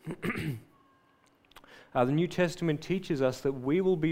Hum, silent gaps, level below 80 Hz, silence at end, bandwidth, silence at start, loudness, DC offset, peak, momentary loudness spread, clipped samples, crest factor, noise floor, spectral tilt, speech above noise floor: none; none; -60 dBFS; 0 s; 16 kHz; 0.05 s; -30 LUFS; under 0.1%; -12 dBFS; 8 LU; under 0.1%; 18 dB; -65 dBFS; -7 dB/octave; 37 dB